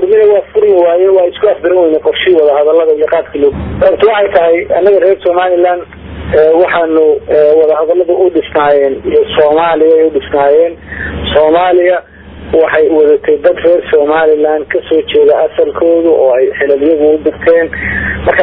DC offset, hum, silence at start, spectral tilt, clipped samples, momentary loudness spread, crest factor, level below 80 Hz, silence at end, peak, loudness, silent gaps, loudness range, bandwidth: under 0.1%; none; 0 s; -9 dB/octave; 0.7%; 5 LU; 8 dB; -34 dBFS; 0 s; 0 dBFS; -9 LUFS; none; 1 LU; 4.1 kHz